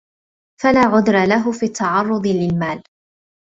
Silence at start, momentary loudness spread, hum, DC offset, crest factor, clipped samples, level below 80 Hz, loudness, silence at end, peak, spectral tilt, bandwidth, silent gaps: 0.6 s; 8 LU; none; under 0.1%; 16 dB; under 0.1%; -50 dBFS; -17 LUFS; 0.6 s; -2 dBFS; -6 dB/octave; 8 kHz; none